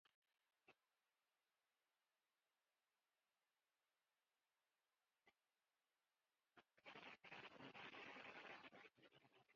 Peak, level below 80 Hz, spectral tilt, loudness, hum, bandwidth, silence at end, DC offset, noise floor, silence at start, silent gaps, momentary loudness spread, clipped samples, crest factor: -46 dBFS; under -90 dBFS; -1 dB/octave; -61 LUFS; none; 7 kHz; 0 s; under 0.1%; under -90 dBFS; 0.05 s; 0.14-0.22 s; 9 LU; under 0.1%; 22 dB